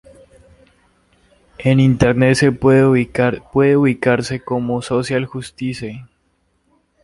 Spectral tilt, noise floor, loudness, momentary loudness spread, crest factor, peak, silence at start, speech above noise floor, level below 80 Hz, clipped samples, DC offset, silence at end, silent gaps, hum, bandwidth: -7 dB/octave; -63 dBFS; -16 LUFS; 13 LU; 16 dB; 0 dBFS; 1.6 s; 48 dB; -42 dBFS; under 0.1%; under 0.1%; 1 s; none; none; 11.5 kHz